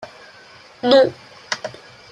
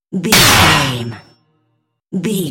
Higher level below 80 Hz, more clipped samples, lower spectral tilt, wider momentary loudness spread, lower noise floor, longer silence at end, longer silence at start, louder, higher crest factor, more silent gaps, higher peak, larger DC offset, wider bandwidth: second, -64 dBFS vs -36 dBFS; neither; about the same, -4 dB/octave vs -3 dB/octave; about the same, 19 LU vs 18 LU; second, -45 dBFS vs -66 dBFS; first, 0.45 s vs 0 s; about the same, 0 s vs 0.1 s; second, -18 LUFS vs -10 LUFS; first, 20 dB vs 14 dB; neither; about the same, -2 dBFS vs 0 dBFS; neither; second, 9.4 kHz vs over 20 kHz